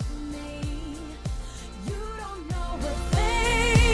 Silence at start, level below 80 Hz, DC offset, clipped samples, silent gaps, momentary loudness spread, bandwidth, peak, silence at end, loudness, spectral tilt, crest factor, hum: 0 s; -30 dBFS; under 0.1%; under 0.1%; none; 14 LU; 12.5 kHz; -8 dBFS; 0 s; -28 LUFS; -4.5 dB/octave; 18 dB; none